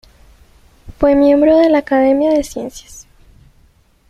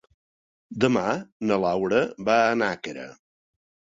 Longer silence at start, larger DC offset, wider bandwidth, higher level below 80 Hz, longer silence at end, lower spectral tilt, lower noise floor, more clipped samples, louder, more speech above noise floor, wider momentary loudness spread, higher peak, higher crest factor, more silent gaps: first, 0.85 s vs 0.7 s; neither; first, 13.5 kHz vs 7.8 kHz; first, -40 dBFS vs -62 dBFS; first, 1.1 s vs 0.8 s; about the same, -5.5 dB/octave vs -5.5 dB/octave; second, -52 dBFS vs under -90 dBFS; neither; first, -12 LUFS vs -24 LUFS; second, 39 dB vs over 66 dB; about the same, 17 LU vs 16 LU; first, -2 dBFS vs -6 dBFS; second, 14 dB vs 20 dB; second, none vs 1.32-1.40 s